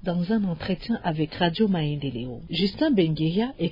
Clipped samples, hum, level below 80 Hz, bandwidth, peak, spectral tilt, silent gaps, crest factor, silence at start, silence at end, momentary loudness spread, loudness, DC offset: under 0.1%; none; -48 dBFS; 5.4 kHz; -10 dBFS; -9 dB/octave; none; 16 dB; 0 s; 0 s; 8 LU; -25 LUFS; under 0.1%